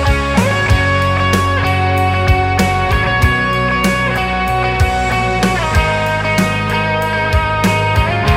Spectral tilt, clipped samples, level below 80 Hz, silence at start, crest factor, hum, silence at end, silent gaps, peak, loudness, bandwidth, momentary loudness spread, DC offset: -5.5 dB/octave; under 0.1%; -22 dBFS; 0 s; 14 dB; none; 0 s; none; 0 dBFS; -14 LUFS; 16.5 kHz; 2 LU; under 0.1%